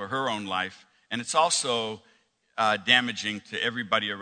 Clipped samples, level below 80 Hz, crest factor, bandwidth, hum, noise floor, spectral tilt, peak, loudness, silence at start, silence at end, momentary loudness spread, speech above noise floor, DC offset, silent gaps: under 0.1%; -72 dBFS; 24 dB; 9.4 kHz; none; -49 dBFS; -2 dB/octave; -4 dBFS; -26 LUFS; 0 s; 0 s; 14 LU; 22 dB; under 0.1%; none